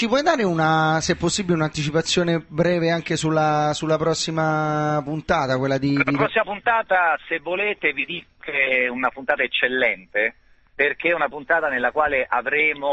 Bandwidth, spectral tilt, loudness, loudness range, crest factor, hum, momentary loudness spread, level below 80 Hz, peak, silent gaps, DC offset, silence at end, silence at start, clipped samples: 8.6 kHz; -4.5 dB/octave; -21 LUFS; 1 LU; 18 dB; none; 4 LU; -52 dBFS; -4 dBFS; none; under 0.1%; 0 s; 0 s; under 0.1%